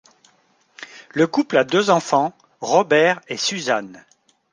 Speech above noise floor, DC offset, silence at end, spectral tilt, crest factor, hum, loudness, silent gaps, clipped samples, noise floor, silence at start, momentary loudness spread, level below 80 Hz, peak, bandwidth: 42 dB; under 0.1%; 0.55 s; -4 dB/octave; 18 dB; none; -19 LUFS; none; under 0.1%; -60 dBFS; 0.8 s; 20 LU; -70 dBFS; -2 dBFS; 10 kHz